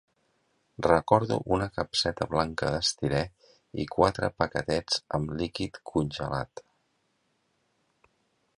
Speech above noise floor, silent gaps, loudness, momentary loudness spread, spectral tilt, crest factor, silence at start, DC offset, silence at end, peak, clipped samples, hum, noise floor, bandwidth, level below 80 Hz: 46 dB; none; -28 LUFS; 9 LU; -5 dB/octave; 26 dB; 0.8 s; under 0.1%; 2 s; -4 dBFS; under 0.1%; none; -74 dBFS; 11.5 kHz; -50 dBFS